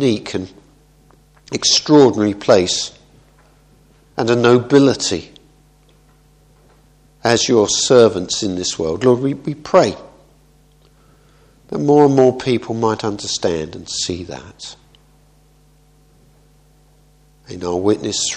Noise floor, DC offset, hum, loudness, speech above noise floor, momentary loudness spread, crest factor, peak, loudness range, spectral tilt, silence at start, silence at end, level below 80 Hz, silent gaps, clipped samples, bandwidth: -52 dBFS; under 0.1%; none; -16 LUFS; 36 dB; 17 LU; 18 dB; 0 dBFS; 10 LU; -4 dB/octave; 0 s; 0 s; -50 dBFS; none; under 0.1%; 10.5 kHz